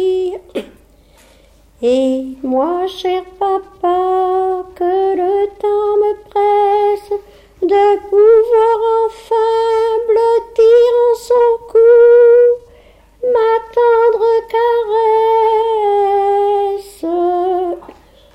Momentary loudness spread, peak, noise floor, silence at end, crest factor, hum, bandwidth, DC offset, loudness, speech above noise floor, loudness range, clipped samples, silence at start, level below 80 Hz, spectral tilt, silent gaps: 11 LU; -2 dBFS; -47 dBFS; 0.55 s; 12 dB; none; 9 kHz; under 0.1%; -13 LUFS; 31 dB; 6 LU; under 0.1%; 0 s; -50 dBFS; -5 dB/octave; none